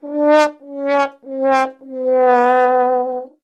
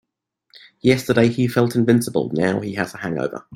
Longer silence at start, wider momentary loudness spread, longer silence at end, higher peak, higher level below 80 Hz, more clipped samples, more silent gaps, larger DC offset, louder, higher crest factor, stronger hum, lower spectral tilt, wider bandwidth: second, 0.05 s vs 0.85 s; about the same, 11 LU vs 9 LU; first, 0.15 s vs 0 s; about the same, -2 dBFS vs -2 dBFS; second, -70 dBFS vs -54 dBFS; neither; neither; neither; first, -16 LUFS vs -19 LUFS; about the same, 14 dB vs 18 dB; neither; second, -3.5 dB/octave vs -6.5 dB/octave; second, 10 kHz vs 16.5 kHz